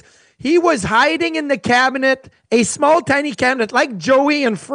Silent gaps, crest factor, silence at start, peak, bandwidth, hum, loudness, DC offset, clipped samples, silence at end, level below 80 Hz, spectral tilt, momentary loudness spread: none; 14 dB; 0.45 s; -2 dBFS; 10.5 kHz; none; -15 LUFS; under 0.1%; under 0.1%; 0 s; -52 dBFS; -3.5 dB/octave; 5 LU